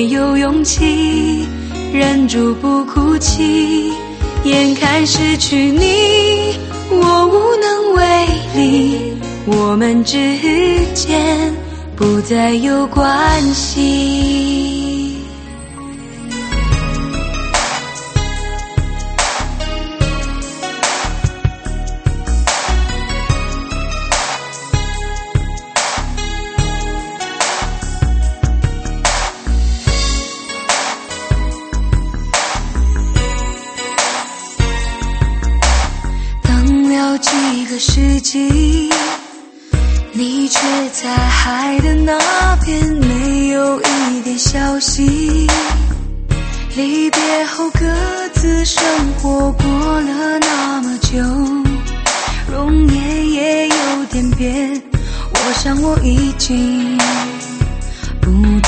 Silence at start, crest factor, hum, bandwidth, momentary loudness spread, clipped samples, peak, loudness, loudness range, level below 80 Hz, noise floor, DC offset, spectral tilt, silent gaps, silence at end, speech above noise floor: 0 s; 14 dB; none; 8.8 kHz; 9 LU; under 0.1%; 0 dBFS; -15 LUFS; 6 LU; -20 dBFS; -35 dBFS; under 0.1%; -4.5 dB/octave; none; 0 s; 22 dB